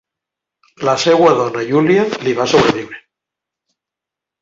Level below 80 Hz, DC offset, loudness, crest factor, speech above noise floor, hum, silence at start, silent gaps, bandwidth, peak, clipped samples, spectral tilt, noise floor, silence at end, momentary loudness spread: -52 dBFS; under 0.1%; -14 LUFS; 16 dB; 71 dB; none; 0.8 s; none; 7.8 kHz; 0 dBFS; under 0.1%; -5 dB/octave; -85 dBFS; 1.4 s; 9 LU